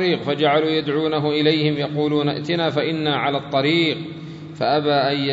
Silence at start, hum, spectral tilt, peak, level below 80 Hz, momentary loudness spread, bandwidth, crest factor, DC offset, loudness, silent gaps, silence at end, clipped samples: 0 s; none; -7 dB/octave; -2 dBFS; -60 dBFS; 5 LU; 7.8 kHz; 16 dB; under 0.1%; -20 LUFS; none; 0 s; under 0.1%